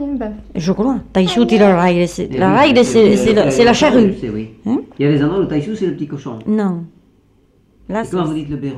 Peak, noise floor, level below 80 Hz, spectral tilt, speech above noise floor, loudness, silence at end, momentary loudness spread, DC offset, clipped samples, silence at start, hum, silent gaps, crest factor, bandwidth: -2 dBFS; -53 dBFS; -40 dBFS; -6 dB/octave; 39 dB; -14 LUFS; 0 s; 14 LU; under 0.1%; under 0.1%; 0 s; none; none; 14 dB; 12.5 kHz